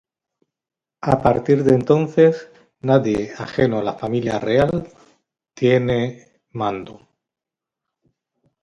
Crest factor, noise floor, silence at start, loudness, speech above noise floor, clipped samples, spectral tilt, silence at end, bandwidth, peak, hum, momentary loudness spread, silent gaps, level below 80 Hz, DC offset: 20 dB; -87 dBFS; 1.05 s; -19 LUFS; 69 dB; under 0.1%; -7.5 dB/octave; 1.7 s; 10 kHz; 0 dBFS; none; 12 LU; none; -48 dBFS; under 0.1%